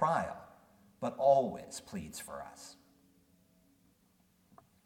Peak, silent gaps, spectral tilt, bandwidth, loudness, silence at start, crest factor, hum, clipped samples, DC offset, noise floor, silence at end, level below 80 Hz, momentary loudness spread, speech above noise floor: -14 dBFS; none; -5 dB/octave; 17 kHz; -34 LUFS; 0 s; 22 dB; none; under 0.1%; under 0.1%; -70 dBFS; 2.1 s; -70 dBFS; 22 LU; 37 dB